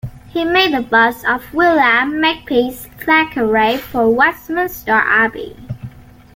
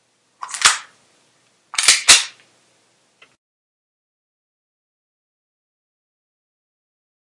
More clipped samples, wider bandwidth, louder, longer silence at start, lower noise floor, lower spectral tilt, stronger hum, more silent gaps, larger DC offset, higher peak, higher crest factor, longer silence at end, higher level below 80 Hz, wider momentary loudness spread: neither; first, 17 kHz vs 12 kHz; about the same, -14 LUFS vs -13 LUFS; second, 0.05 s vs 0.45 s; second, -35 dBFS vs -60 dBFS; first, -5 dB/octave vs 3 dB/octave; neither; neither; neither; about the same, 0 dBFS vs 0 dBFS; second, 14 dB vs 24 dB; second, 0.45 s vs 5.1 s; first, -44 dBFS vs -60 dBFS; second, 13 LU vs 20 LU